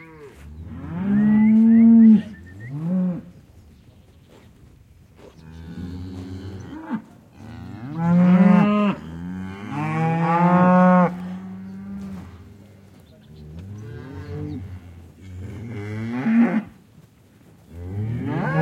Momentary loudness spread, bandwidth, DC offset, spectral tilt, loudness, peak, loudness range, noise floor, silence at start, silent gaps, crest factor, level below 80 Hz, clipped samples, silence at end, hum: 24 LU; 6.4 kHz; under 0.1%; -9.5 dB/octave; -18 LUFS; -4 dBFS; 20 LU; -51 dBFS; 0 s; none; 16 dB; -54 dBFS; under 0.1%; 0 s; none